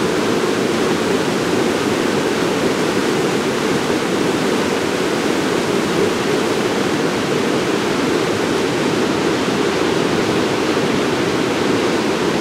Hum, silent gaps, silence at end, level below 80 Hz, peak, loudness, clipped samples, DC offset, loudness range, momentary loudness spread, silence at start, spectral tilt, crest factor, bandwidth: none; none; 0 s; -50 dBFS; -4 dBFS; -17 LUFS; under 0.1%; under 0.1%; 0 LU; 1 LU; 0 s; -4.5 dB/octave; 14 dB; 16 kHz